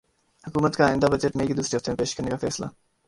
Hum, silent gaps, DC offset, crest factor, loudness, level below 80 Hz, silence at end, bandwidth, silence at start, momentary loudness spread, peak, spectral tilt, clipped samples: none; none; under 0.1%; 20 dB; -25 LUFS; -48 dBFS; 0.4 s; 11.5 kHz; 0.45 s; 11 LU; -4 dBFS; -5 dB/octave; under 0.1%